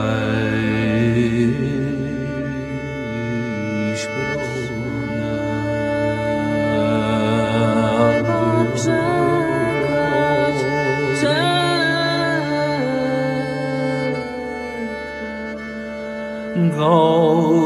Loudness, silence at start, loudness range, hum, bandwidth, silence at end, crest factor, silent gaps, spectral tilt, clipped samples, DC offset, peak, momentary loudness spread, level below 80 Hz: -19 LUFS; 0 s; 6 LU; none; 13 kHz; 0 s; 16 dB; none; -6.5 dB/octave; under 0.1%; under 0.1%; -2 dBFS; 10 LU; -44 dBFS